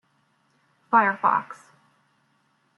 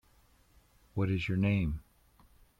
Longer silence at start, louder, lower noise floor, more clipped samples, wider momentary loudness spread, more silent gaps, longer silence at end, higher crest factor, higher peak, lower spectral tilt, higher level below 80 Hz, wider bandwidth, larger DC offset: about the same, 0.9 s vs 0.95 s; first, -22 LUFS vs -33 LUFS; about the same, -67 dBFS vs -65 dBFS; neither; first, 23 LU vs 12 LU; neither; first, 1.25 s vs 0.8 s; first, 22 dB vs 16 dB; first, -6 dBFS vs -20 dBFS; second, -6.5 dB/octave vs -8 dB/octave; second, -82 dBFS vs -50 dBFS; first, 11 kHz vs 7.4 kHz; neither